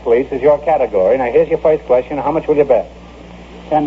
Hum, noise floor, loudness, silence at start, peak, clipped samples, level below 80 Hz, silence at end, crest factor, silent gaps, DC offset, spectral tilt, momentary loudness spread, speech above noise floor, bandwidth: none; -35 dBFS; -14 LUFS; 0 s; 0 dBFS; under 0.1%; -40 dBFS; 0 s; 14 dB; none; under 0.1%; -8 dB/octave; 5 LU; 22 dB; 7.2 kHz